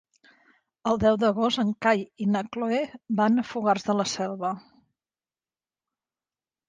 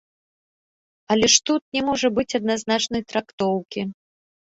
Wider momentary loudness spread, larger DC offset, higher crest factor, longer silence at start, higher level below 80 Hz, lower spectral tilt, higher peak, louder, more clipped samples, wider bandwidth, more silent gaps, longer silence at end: second, 7 LU vs 12 LU; neither; about the same, 20 dB vs 22 dB; second, 0.85 s vs 1.1 s; about the same, -58 dBFS vs -56 dBFS; first, -5 dB/octave vs -2.5 dB/octave; second, -8 dBFS vs -2 dBFS; second, -25 LUFS vs -21 LUFS; neither; first, 9.4 kHz vs 8 kHz; second, none vs 1.61-1.72 s, 3.33-3.38 s; first, 2.1 s vs 0.55 s